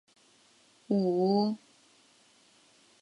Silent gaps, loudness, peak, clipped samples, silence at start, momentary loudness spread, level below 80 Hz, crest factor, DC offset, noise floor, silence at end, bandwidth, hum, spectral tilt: none; -29 LUFS; -16 dBFS; under 0.1%; 0.9 s; 7 LU; -76 dBFS; 18 dB; under 0.1%; -63 dBFS; 1.45 s; 11 kHz; none; -8 dB/octave